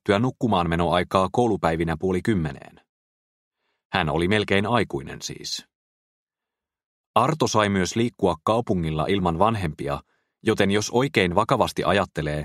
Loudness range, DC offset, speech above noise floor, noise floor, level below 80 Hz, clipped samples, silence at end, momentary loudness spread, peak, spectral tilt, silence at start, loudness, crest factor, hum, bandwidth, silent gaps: 3 LU; under 0.1%; 66 dB; -88 dBFS; -46 dBFS; under 0.1%; 0 s; 10 LU; -4 dBFS; -5.5 dB/octave; 0.05 s; -23 LUFS; 20 dB; none; 15 kHz; 2.89-3.51 s, 3.85-3.90 s, 5.75-6.27 s, 6.85-7.14 s